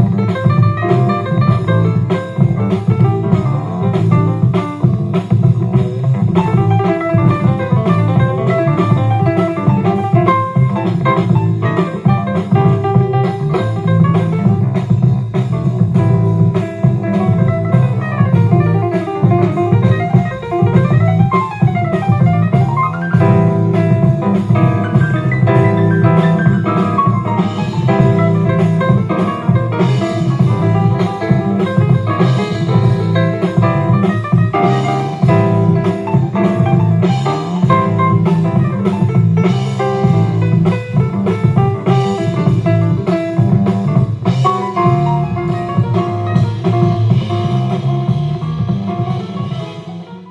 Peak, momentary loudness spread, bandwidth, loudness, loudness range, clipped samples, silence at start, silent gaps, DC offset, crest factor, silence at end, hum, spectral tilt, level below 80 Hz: 0 dBFS; 4 LU; 7.8 kHz; -13 LUFS; 2 LU; under 0.1%; 0 s; none; under 0.1%; 12 dB; 0 s; none; -9 dB/octave; -40 dBFS